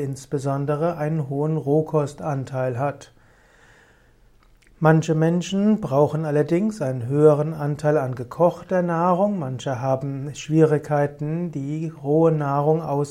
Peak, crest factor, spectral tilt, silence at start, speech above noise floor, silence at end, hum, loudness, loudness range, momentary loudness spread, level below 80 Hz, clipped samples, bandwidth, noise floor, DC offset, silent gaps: -4 dBFS; 18 dB; -8 dB/octave; 0 s; 33 dB; 0 s; none; -22 LUFS; 5 LU; 9 LU; -56 dBFS; under 0.1%; 11 kHz; -55 dBFS; under 0.1%; none